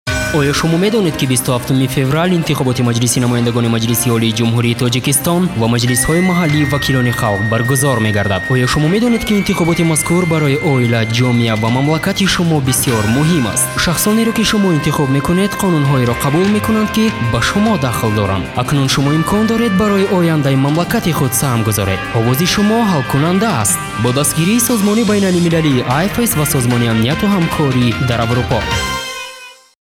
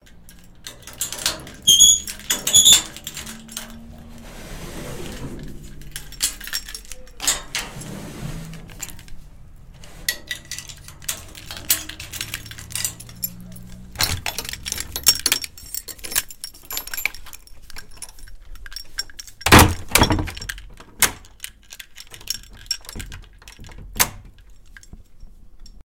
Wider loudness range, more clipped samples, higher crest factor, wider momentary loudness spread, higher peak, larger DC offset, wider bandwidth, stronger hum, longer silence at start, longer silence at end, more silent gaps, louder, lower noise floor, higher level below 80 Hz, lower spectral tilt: second, 1 LU vs 16 LU; neither; second, 12 dB vs 24 dB; second, 3 LU vs 26 LU; about the same, -2 dBFS vs 0 dBFS; neither; about the same, 17 kHz vs 17 kHz; neither; about the same, 0.05 s vs 0.15 s; first, 0.3 s vs 0.05 s; neither; first, -13 LUFS vs -19 LUFS; second, -36 dBFS vs -44 dBFS; about the same, -36 dBFS vs -38 dBFS; first, -5 dB/octave vs -1.5 dB/octave